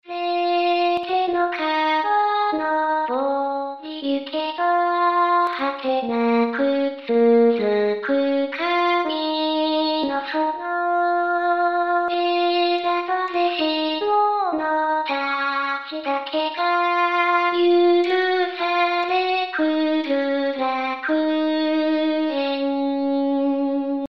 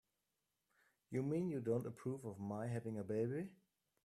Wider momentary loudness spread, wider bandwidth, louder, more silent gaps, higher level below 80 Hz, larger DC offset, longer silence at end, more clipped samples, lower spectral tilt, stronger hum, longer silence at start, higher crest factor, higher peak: about the same, 5 LU vs 7 LU; second, 6.2 kHz vs 14 kHz; first, -21 LUFS vs -43 LUFS; neither; first, -70 dBFS vs -80 dBFS; first, 0.1% vs under 0.1%; second, 0 s vs 0.5 s; neither; second, -5.5 dB/octave vs -9 dB/octave; neither; second, 0.05 s vs 1.1 s; about the same, 14 dB vs 18 dB; first, -8 dBFS vs -26 dBFS